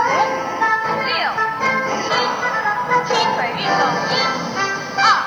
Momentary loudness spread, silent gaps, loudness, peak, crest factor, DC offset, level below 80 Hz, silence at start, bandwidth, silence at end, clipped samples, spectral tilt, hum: 3 LU; none; -18 LUFS; -2 dBFS; 16 dB; under 0.1%; -58 dBFS; 0 s; over 20 kHz; 0 s; under 0.1%; -3 dB/octave; none